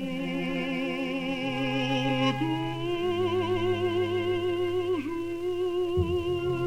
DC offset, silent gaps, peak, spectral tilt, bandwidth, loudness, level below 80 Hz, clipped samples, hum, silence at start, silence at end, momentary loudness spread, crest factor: under 0.1%; none; -14 dBFS; -6.5 dB/octave; 12.5 kHz; -28 LUFS; -50 dBFS; under 0.1%; none; 0 s; 0 s; 4 LU; 14 dB